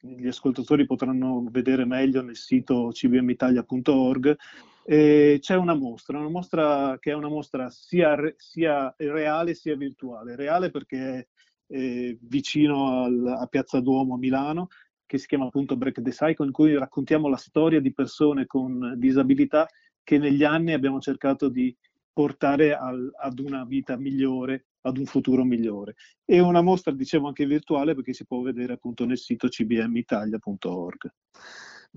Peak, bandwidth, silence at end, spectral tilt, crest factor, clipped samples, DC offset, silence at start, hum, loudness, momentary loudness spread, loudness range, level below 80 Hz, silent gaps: -8 dBFS; 7.6 kHz; 0.2 s; -7.5 dB/octave; 16 dB; under 0.1%; under 0.1%; 0.05 s; none; -24 LUFS; 12 LU; 6 LU; -62 dBFS; 11.27-11.36 s, 14.90-14.94 s, 19.98-20.05 s, 22.04-22.14 s, 24.65-24.83 s, 26.18-26.22 s, 31.17-31.22 s